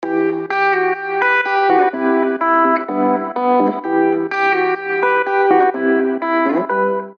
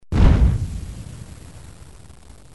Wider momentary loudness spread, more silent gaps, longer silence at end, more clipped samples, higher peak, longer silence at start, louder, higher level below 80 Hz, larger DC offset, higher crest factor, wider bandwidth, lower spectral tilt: second, 4 LU vs 26 LU; neither; second, 0.05 s vs 0.95 s; neither; about the same, -2 dBFS vs -2 dBFS; about the same, 0 s vs 0.1 s; first, -16 LUFS vs -19 LUFS; second, -78 dBFS vs -22 dBFS; second, under 0.1% vs 0.5%; about the same, 14 dB vs 18 dB; second, 6.4 kHz vs 11.5 kHz; about the same, -7 dB/octave vs -7.5 dB/octave